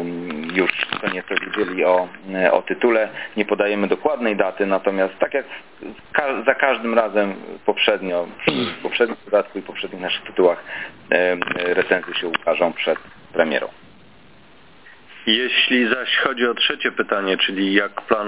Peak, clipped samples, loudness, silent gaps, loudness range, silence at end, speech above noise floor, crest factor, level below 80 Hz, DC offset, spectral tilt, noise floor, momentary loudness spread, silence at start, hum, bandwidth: 0 dBFS; under 0.1%; -20 LUFS; none; 3 LU; 0 s; 29 dB; 20 dB; -62 dBFS; 0.4%; -8 dB/octave; -49 dBFS; 9 LU; 0 s; none; 4 kHz